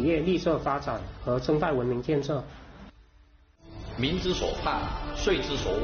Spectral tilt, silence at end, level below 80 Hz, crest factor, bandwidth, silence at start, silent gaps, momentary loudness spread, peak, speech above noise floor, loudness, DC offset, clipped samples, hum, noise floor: -4.5 dB/octave; 0 s; -40 dBFS; 14 dB; 6.8 kHz; 0 s; none; 16 LU; -14 dBFS; 30 dB; -28 LUFS; under 0.1%; under 0.1%; none; -58 dBFS